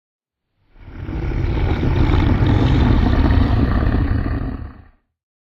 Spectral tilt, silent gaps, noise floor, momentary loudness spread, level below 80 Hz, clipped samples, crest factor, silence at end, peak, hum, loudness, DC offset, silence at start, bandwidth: -9 dB/octave; none; -66 dBFS; 13 LU; -22 dBFS; under 0.1%; 14 dB; 0.85 s; -2 dBFS; none; -18 LUFS; under 0.1%; 0.85 s; 6.2 kHz